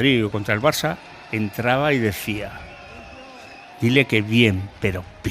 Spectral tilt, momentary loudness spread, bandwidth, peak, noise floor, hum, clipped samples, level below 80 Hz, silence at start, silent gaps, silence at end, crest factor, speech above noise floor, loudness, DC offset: -5.5 dB/octave; 22 LU; 15.5 kHz; -2 dBFS; -41 dBFS; none; under 0.1%; -48 dBFS; 0 s; none; 0 s; 20 dB; 21 dB; -21 LUFS; under 0.1%